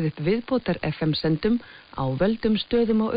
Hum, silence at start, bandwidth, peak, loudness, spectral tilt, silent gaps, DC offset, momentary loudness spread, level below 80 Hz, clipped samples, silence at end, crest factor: none; 0 s; 5.2 kHz; -10 dBFS; -24 LUFS; -10 dB/octave; none; under 0.1%; 6 LU; -46 dBFS; under 0.1%; 0 s; 14 dB